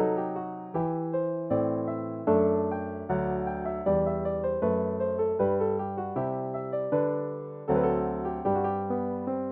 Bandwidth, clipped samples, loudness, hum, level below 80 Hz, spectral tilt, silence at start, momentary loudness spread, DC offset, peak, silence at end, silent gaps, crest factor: 3.7 kHz; under 0.1%; -29 LUFS; none; -52 dBFS; -9.5 dB/octave; 0 s; 6 LU; under 0.1%; -12 dBFS; 0 s; none; 16 dB